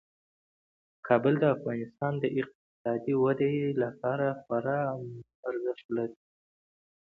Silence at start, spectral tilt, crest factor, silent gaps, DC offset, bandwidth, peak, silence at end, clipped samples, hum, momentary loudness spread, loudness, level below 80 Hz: 1.05 s; -10 dB/octave; 20 dB; 2.55-2.85 s, 5.35-5.43 s, 5.84-5.89 s; under 0.1%; 4.2 kHz; -10 dBFS; 1.05 s; under 0.1%; none; 12 LU; -30 LUFS; -72 dBFS